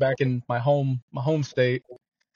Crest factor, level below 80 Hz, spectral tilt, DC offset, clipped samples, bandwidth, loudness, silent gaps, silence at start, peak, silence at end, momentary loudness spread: 16 dB; -64 dBFS; -7.5 dB/octave; under 0.1%; under 0.1%; 7.2 kHz; -25 LUFS; 1.02-1.08 s; 0 s; -8 dBFS; 0.4 s; 5 LU